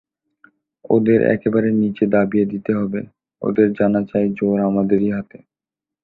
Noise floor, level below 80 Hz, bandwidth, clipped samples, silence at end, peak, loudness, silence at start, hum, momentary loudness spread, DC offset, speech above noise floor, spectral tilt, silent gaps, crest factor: -88 dBFS; -54 dBFS; 4.1 kHz; under 0.1%; 0.65 s; -2 dBFS; -18 LUFS; 0.85 s; none; 10 LU; under 0.1%; 71 dB; -11.5 dB/octave; none; 16 dB